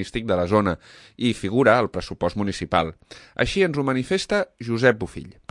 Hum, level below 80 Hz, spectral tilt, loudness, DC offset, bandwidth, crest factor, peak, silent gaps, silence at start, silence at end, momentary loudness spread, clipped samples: none; -46 dBFS; -5.5 dB/octave; -22 LUFS; under 0.1%; 11.5 kHz; 20 dB; -2 dBFS; none; 0 s; 0.2 s; 10 LU; under 0.1%